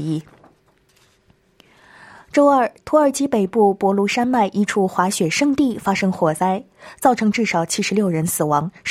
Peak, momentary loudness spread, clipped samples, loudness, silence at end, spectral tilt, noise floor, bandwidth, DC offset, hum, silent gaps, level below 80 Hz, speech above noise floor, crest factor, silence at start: -2 dBFS; 4 LU; under 0.1%; -18 LUFS; 0 s; -5 dB/octave; -58 dBFS; 16 kHz; under 0.1%; none; none; -58 dBFS; 40 dB; 16 dB; 0 s